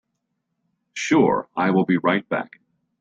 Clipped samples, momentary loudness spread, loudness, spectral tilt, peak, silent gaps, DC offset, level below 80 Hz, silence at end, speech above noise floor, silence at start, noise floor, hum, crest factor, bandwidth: under 0.1%; 13 LU; -21 LUFS; -6 dB/octave; -4 dBFS; none; under 0.1%; -64 dBFS; 0.55 s; 56 dB; 0.95 s; -76 dBFS; none; 18 dB; 7.8 kHz